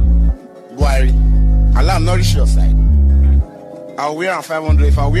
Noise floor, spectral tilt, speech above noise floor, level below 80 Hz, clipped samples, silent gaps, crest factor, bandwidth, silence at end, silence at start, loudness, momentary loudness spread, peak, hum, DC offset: -32 dBFS; -6.5 dB/octave; 20 dB; -12 dBFS; under 0.1%; none; 8 dB; 12.5 kHz; 0 s; 0 s; -14 LUFS; 11 LU; -4 dBFS; none; under 0.1%